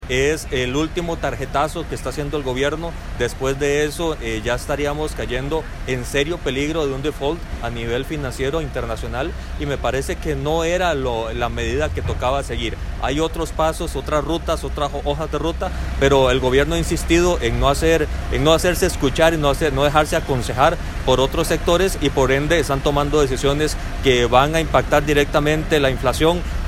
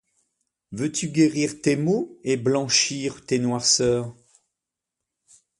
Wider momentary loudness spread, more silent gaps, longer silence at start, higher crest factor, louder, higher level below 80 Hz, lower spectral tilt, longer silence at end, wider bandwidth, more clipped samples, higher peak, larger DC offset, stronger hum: about the same, 9 LU vs 9 LU; neither; second, 0 s vs 0.7 s; about the same, 18 dB vs 20 dB; about the same, -20 LUFS vs -22 LUFS; first, -28 dBFS vs -60 dBFS; first, -5 dB/octave vs -3.5 dB/octave; second, 0 s vs 1.45 s; first, 16.5 kHz vs 11.5 kHz; neither; first, 0 dBFS vs -4 dBFS; neither; neither